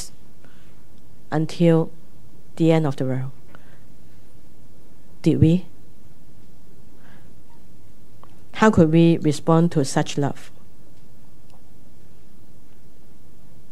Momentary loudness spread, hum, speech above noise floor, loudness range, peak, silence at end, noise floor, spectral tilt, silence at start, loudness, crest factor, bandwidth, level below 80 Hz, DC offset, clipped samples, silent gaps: 14 LU; none; 34 dB; 7 LU; -2 dBFS; 3.4 s; -52 dBFS; -7 dB/octave; 0 s; -20 LUFS; 22 dB; 12 kHz; -50 dBFS; 5%; under 0.1%; none